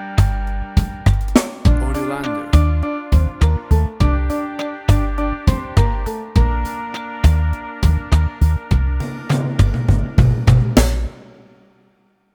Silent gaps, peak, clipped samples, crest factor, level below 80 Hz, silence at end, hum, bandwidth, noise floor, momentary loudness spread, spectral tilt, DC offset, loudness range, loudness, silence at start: none; 0 dBFS; under 0.1%; 16 dB; -20 dBFS; 1.2 s; none; 20 kHz; -59 dBFS; 8 LU; -7 dB/octave; under 0.1%; 2 LU; -18 LUFS; 0 s